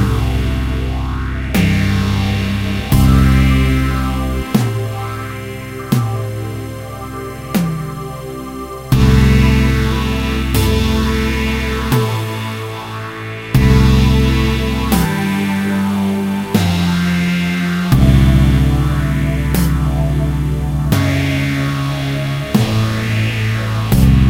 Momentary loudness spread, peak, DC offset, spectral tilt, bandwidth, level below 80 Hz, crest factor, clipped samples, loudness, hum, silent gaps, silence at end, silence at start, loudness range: 13 LU; 0 dBFS; under 0.1%; -6.5 dB/octave; 16 kHz; -20 dBFS; 14 dB; under 0.1%; -15 LUFS; none; none; 0 s; 0 s; 6 LU